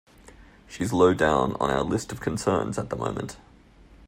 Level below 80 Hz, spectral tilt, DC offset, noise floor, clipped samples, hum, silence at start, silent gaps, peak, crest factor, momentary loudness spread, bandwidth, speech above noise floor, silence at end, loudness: -48 dBFS; -5.5 dB/octave; under 0.1%; -52 dBFS; under 0.1%; none; 0.4 s; none; -6 dBFS; 20 dB; 12 LU; 16 kHz; 28 dB; 0 s; -25 LUFS